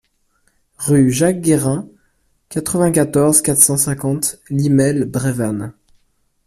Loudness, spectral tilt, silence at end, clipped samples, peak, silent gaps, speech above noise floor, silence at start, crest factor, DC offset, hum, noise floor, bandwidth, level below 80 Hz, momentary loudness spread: -15 LUFS; -5 dB/octave; 0.75 s; under 0.1%; 0 dBFS; none; 46 dB; 0.8 s; 16 dB; under 0.1%; none; -62 dBFS; 16 kHz; -48 dBFS; 13 LU